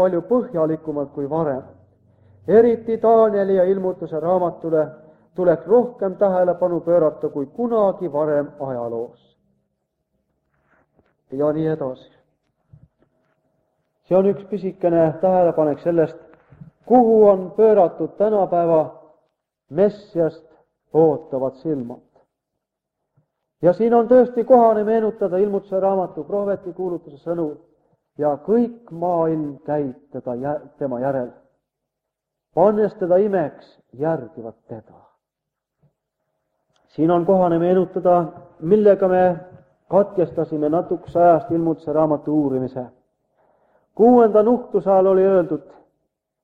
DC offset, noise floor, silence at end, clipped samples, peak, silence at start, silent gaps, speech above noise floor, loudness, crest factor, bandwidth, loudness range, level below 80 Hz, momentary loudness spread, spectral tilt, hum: under 0.1%; -82 dBFS; 0.85 s; under 0.1%; -2 dBFS; 0 s; none; 64 dB; -19 LUFS; 18 dB; 4.8 kHz; 10 LU; -60 dBFS; 13 LU; -10.5 dB/octave; none